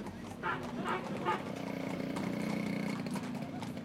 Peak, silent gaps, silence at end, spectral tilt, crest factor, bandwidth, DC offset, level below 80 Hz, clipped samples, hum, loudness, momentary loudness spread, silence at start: -20 dBFS; none; 0 s; -6 dB/octave; 18 dB; 16.5 kHz; under 0.1%; -66 dBFS; under 0.1%; none; -38 LUFS; 5 LU; 0 s